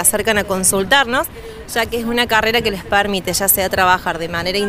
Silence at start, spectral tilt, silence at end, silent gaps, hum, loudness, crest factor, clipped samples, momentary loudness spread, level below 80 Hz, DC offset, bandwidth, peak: 0 s; -2 dB/octave; 0 s; none; none; -16 LUFS; 16 dB; under 0.1%; 7 LU; -38 dBFS; under 0.1%; 16 kHz; 0 dBFS